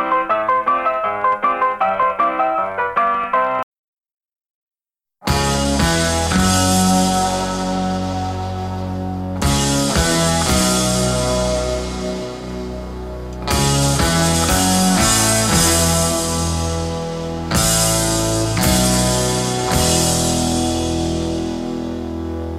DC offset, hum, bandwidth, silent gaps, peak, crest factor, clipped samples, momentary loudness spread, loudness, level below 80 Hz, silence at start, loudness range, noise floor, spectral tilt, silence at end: under 0.1%; none; 16 kHz; 3.63-3.72 s, 3.78-3.93 s, 4.14-4.18 s, 4.50-4.67 s; -2 dBFS; 14 dB; under 0.1%; 11 LU; -17 LUFS; -30 dBFS; 0 s; 5 LU; -87 dBFS; -3.5 dB/octave; 0 s